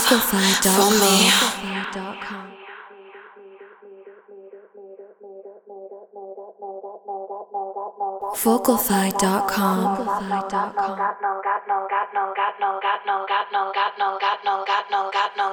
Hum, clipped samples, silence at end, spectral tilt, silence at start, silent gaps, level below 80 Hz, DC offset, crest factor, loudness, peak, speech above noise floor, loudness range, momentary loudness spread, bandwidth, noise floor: none; under 0.1%; 0 s; -2.5 dB/octave; 0 s; none; -58 dBFS; under 0.1%; 20 dB; -21 LUFS; -4 dBFS; 24 dB; 22 LU; 24 LU; over 20 kHz; -45 dBFS